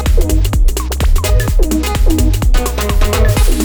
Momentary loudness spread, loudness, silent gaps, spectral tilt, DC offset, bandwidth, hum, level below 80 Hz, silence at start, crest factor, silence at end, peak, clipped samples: 3 LU; -14 LUFS; none; -5 dB/octave; under 0.1%; over 20 kHz; none; -12 dBFS; 0 s; 10 dB; 0 s; 0 dBFS; under 0.1%